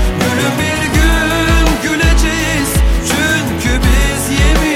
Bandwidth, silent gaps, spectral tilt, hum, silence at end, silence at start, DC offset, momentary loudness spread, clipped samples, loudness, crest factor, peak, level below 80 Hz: 16.5 kHz; none; -4.5 dB/octave; none; 0 s; 0 s; under 0.1%; 2 LU; under 0.1%; -13 LUFS; 12 dB; 0 dBFS; -16 dBFS